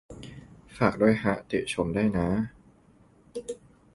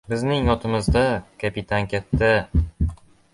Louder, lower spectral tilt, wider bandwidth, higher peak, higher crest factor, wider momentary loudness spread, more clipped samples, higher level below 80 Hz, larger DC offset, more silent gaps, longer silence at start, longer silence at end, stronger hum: second, -27 LUFS vs -22 LUFS; about the same, -6.5 dB/octave vs -6.5 dB/octave; about the same, 11.5 kHz vs 11.5 kHz; about the same, -6 dBFS vs -6 dBFS; first, 22 dB vs 16 dB; first, 21 LU vs 9 LU; neither; second, -50 dBFS vs -30 dBFS; neither; neither; about the same, 0.1 s vs 0.1 s; about the same, 0.4 s vs 0.4 s; neither